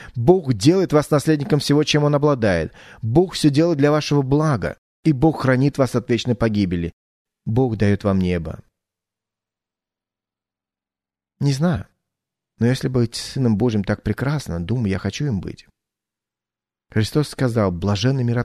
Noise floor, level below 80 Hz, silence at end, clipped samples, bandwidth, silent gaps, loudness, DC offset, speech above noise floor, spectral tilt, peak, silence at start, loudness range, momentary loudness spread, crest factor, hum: under -90 dBFS; -44 dBFS; 0 s; under 0.1%; 13.5 kHz; 4.78-5.03 s, 6.93-7.25 s; -19 LUFS; under 0.1%; over 72 dB; -6.5 dB/octave; 0 dBFS; 0 s; 10 LU; 8 LU; 20 dB; none